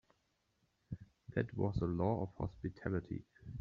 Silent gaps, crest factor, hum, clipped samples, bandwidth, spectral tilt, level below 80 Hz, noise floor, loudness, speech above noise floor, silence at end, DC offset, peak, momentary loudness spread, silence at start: none; 20 dB; none; under 0.1%; 6.8 kHz; -8.5 dB/octave; -58 dBFS; -80 dBFS; -40 LUFS; 42 dB; 0 s; under 0.1%; -20 dBFS; 15 LU; 0.9 s